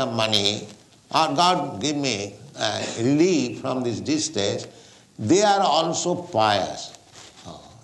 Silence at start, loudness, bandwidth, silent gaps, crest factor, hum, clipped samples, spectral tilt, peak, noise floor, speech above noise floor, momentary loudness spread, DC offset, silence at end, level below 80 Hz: 0 s; -22 LUFS; 12 kHz; none; 18 dB; none; under 0.1%; -4 dB/octave; -4 dBFS; -47 dBFS; 24 dB; 17 LU; under 0.1%; 0.15 s; -64 dBFS